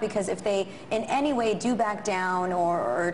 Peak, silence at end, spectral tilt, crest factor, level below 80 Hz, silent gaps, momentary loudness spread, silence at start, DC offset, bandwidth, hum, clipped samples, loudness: -12 dBFS; 0 s; -5 dB/octave; 14 dB; -60 dBFS; none; 3 LU; 0 s; 0.3%; 11.5 kHz; none; under 0.1%; -27 LUFS